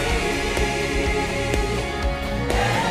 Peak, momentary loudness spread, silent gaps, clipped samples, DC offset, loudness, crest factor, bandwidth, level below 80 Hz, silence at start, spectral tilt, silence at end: -8 dBFS; 4 LU; none; under 0.1%; under 0.1%; -23 LUFS; 14 dB; 16 kHz; -28 dBFS; 0 s; -4.5 dB/octave; 0 s